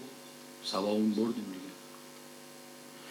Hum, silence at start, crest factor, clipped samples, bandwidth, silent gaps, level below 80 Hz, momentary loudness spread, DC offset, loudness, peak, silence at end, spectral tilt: 50 Hz at -70 dBFS; 0 s; 18 dB; under 0.1%; 18 kHz; none; under -90 dBFS; 19 LU; under 0.1%; -33 LUFS; -18 dBFS; 0 s; -5 dB/octave